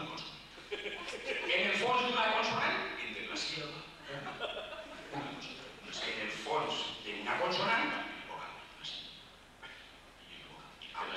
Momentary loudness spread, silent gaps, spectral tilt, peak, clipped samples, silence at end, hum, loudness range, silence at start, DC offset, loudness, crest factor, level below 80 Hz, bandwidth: 20 LU; none; -3 dB/octave; -20 dBFS; under 0.1%; 0 s; none; 8 LU; 0 s; under 0.1%; -36 LUFS; 18 dB; -66 dBFS; 15 kHz